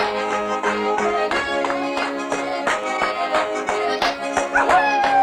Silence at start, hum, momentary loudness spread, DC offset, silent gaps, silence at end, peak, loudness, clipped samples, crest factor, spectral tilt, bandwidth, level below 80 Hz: 0 s; none; 7 LU; under 0.1%; none; 0 s; -6 dBFS; -20 LUFS; under 0.1%; 14 dB; -3 dB/octave; 15 kHz; -52 dBFS